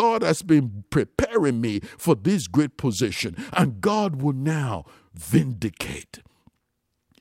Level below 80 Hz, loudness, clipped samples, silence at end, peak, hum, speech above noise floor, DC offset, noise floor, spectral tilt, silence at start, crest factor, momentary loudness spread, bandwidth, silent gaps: -48 dBFS; -24 LUFS; under 0.1%; 1.05 s; -6 dBFS; none; 53 dB; under 0.1%; -76 dBFS; -6 dB/octave; 0 s; 18 dB; 9 LU; 16 kHz; none